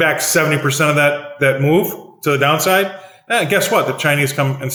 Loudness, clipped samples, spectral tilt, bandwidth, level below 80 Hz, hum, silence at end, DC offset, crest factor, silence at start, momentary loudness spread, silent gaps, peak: -15 LUFS; under 0.1%; -4 dB/octave; over 20 kHz; -62 dBFS; none; 0 s; under 0.1%; 14 dB; 0 s; 6 LU; none; -2 dBFS